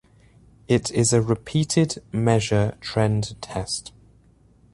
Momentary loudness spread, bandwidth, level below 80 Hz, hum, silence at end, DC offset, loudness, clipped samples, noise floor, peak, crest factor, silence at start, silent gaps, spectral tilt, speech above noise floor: 9 LU; 11.5 kHz; -48 dBFS; none; 0.85 s; under 0.1%; -23 LUFS; under 0.1%; -56 dBFS; -4 dBFS; 18 dB; 0.7 s; none; -5 dB/octave; 34 dB